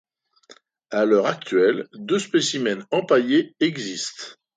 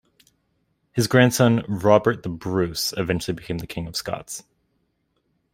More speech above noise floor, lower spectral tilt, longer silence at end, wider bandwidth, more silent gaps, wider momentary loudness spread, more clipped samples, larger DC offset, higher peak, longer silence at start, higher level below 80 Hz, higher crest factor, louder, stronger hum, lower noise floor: second, 32 dB vs 49 dB; about the same, -4 dB/octave vs -5 dB/octave; second, 0.25 s vs 1.15 s; second, 9.6 kHz vs 16 kHz; neither; second, 10 LU vs 13 LU; neither; neither; about the same, -4 dBFS vs -2 dBFS; second, 0.5 s vs 0.95 s; second, -72 dBFS vs -52 dBFS; about the same, 18 dB vs 22 dB; about the same, -22 LUFS vs -22 LUFS; neither; second, -53 dBFS vs -71 dBFS